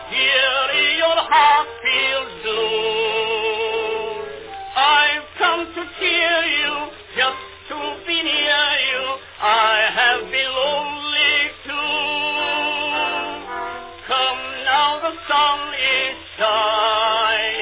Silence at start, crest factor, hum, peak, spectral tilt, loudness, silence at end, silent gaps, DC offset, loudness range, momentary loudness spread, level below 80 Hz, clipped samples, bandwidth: 0 s; 16 dB; none; -2 dBFS; -5 dB/octave; -18 LUFS; 0 s; none; under 0.1%; 3 LU; 12 LU; -54 dBFS; under 0.1%; 4 kHz